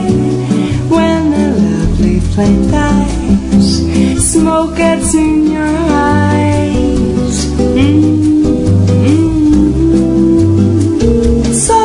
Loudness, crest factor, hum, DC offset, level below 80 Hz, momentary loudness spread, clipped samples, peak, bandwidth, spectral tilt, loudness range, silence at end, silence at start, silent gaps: -10 LUFS; 10 dB; none; under 0.1%; -22 dBFS; 3 LU; under 0.1%; 0 dBFS; 11 kHz; -6 dB/octave; 2 LU; 0 s; 0 s; none